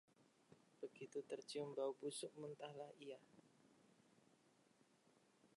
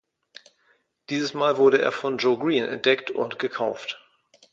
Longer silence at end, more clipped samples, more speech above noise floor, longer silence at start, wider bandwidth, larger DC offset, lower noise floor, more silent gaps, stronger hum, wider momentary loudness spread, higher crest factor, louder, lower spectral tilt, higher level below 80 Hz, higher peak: second, 0.1 s vs 0.55 s; neither; second, 26 dB vs 43 dB; second, 0.2 s vs 1.1 s; first, 11 kHz vs 7.6 kHz; neither; first, -77 dBFS vs -66 dBFS; neither; neither; about the same, 11 LU vs 12 LU; about the same, 20 dB vs 20 dB; second, -52 LUFS vs -23 LUFS; about the same, -4 dB/octave vs -4.5 dB/octave; second, under -90 dBFS vs -74 dBFS; second, -36 dBFS vs -6 dBFS